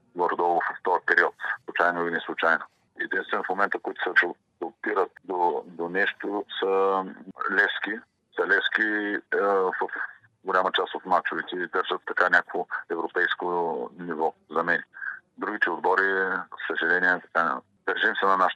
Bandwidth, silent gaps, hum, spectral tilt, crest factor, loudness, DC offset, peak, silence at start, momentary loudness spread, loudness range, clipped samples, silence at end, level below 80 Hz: 8.4 kHz; none; none; -5 dB/octave; 22 dB; -25 LUFS; under 0.1%; -4 dBFS; 0.15 s; 11 LU; 2 LU; under 0.1%; 0 s; -86 dBFS